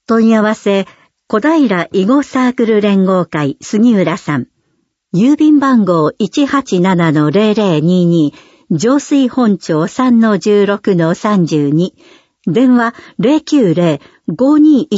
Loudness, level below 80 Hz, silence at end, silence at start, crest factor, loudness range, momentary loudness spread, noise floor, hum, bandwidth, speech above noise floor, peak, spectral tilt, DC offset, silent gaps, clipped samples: -12 LUFS; -58 dBFS; 0 s; 0.1 s; 12 dB; 2 LU; 8 LU; -63 dBFS; none; 8 kHz; 53 dB; 0 dBFS; -7 dB/octave; under 0.1%; none; under 0.1%